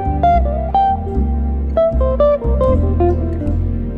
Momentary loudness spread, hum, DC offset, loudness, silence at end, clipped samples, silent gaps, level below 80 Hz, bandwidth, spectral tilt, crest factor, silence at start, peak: 5 LU; none; under 0.1%; -16 LUFS; 0 s; under 0.1%; none; -20 dBFS; 4.2 kHz; -10.5 dB/octave; 12 dB; 0 s; -2 dBFS